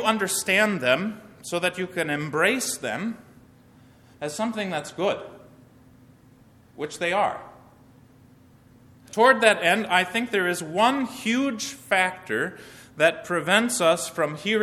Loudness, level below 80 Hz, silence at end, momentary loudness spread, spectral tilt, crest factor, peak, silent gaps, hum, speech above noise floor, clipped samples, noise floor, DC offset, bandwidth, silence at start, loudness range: -23 LUFS; -66 dBFS; 0 s; 14 LU; -3 dB/octave; 24 dB; 0 dBFS; none; none; 30 dB; under 0.1%; -54 dBFS; under 0.1%; 16 kHz; 0 s; 10 LU